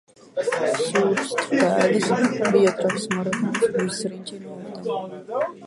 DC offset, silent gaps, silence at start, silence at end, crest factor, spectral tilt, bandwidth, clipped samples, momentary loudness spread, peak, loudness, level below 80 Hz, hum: under 0.1%; none; 0.35 s; 0 s; 18 dB; -5 dB/octave; 11.5 kHz; under 0.1%; 13 LU; -6 dBFS; -22 LUFS; -68 dBFS; none